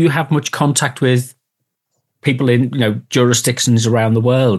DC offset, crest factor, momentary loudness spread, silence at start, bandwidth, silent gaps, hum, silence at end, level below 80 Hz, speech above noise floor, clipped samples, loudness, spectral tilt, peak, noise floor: under 0.1%; 14 dB; 5 LU; 0 s; 12.5 kHz; none; none; 0 s; -60 dBFS; 61 dB; under 0.1%; -15 LUFS; -5 dB/octave; 0 dBFS; -75 dBFS